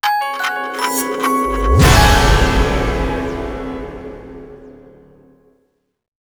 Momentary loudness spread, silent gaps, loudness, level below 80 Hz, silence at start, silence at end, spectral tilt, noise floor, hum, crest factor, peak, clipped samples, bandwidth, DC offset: 21 LU; none; -15 LUFS; -22 dBFS; 0.05 s; 1.5 s; -4.5 dB/octave; -64 dBFS; none; 16 dB; 0 dBFS; under 0.1%; over 20 kHz; under 0.1%